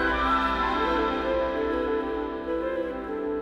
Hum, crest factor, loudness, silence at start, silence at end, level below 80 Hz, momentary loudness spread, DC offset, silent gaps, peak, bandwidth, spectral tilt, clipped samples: none; 14 dB; -27 LUFS; 0 s; 0 s; -42 dBFS; 7 LU; under 0.1%; none; -14 dBFS; 12.5 kHz; -6 dB/octave; under 0.1%